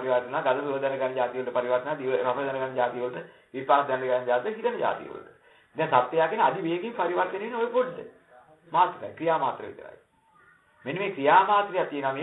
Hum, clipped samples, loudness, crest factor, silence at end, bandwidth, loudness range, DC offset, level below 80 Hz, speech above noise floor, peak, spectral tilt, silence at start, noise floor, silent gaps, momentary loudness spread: none; under 0.1%; -26 LUFS; 22 dB; 0 s; 4.1 kHz; 3 LU; under 0.1%; -78 dBFS; 34 dB; -6 dBFS; -8 dB/octave; 0 s; -60 dBFS; none; 13 LU